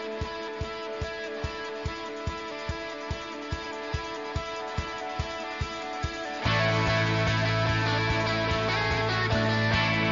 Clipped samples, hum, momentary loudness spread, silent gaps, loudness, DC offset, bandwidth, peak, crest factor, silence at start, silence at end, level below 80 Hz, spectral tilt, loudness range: under 0.1%; none; 10 LU; none; -29 LUFS; under 0.1%; 7.6 kHz; -14 dBFS; 16 dB; 0 s; 0 s; -42 dBFS; -5.5 dB/octave; 9 LU